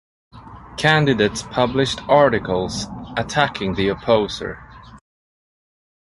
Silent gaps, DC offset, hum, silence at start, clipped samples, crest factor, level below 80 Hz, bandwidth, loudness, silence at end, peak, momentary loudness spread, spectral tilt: none; under 0.1%; none; 0.35 s; under 0.1%; 18 dB; -44 dBFS; 11.5 kHz; -19 LUFS; 1.1 s; -2 dBFS; 13 LU; -5 dB/octave